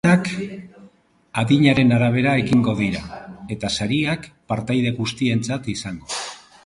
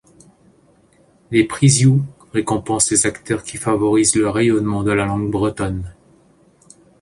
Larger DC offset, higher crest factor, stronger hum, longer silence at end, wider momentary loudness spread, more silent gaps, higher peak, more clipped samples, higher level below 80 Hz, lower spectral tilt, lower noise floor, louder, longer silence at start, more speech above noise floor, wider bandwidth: neither; about the same, 18 dB vs 18 dB; neither; second, 0.3 s vs 1.1 s; first, 14 LU vs 10 LU; neither; about the same, -2 dBFS vs 0 dBFS; neither; about the same, -48 dBFS vs -44 dBFS; about the same, -6 dB/octave vs -5 dB/octave; about the same, -53 dBFS vs -54 dBFS; second, -20 LUFS vs -17 LUFS; second, 0.05 s vs 1.3 s; second, 33 dB vs 37 dB; about the same, 11.5 kHz vs 11.5 kHz